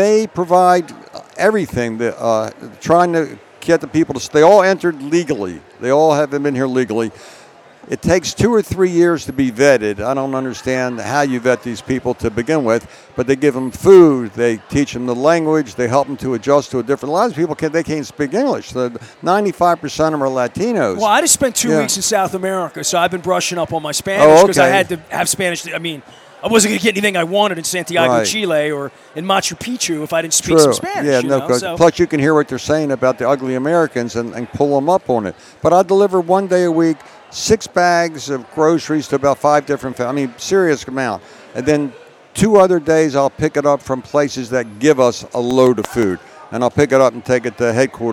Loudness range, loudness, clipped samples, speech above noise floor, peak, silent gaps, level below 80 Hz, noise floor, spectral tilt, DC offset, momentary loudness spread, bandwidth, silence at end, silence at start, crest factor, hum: 4 LU; -15 LUFS; under 0.1%; 27 dB; 0 dBFS; none; -48 dBFS; -42 dBFS; -4.5 dB/octave; under 0.1%; 10 LU; 16.5 kHz; 0 s; 0 s; 16 dB; none